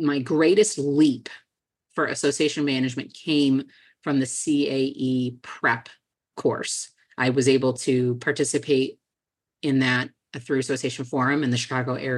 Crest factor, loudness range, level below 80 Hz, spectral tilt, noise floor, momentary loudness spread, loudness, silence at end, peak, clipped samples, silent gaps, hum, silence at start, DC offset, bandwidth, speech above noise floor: 18 dB; 2 LU; -72 dBFS; -4.5 dB/octave; -88 dBFS; 11 LU; -23 LUFS; 0 s; -6 dBFS; under 0.1%; none; none; 0 s; under 0.1%; 12 kHz; 65 dB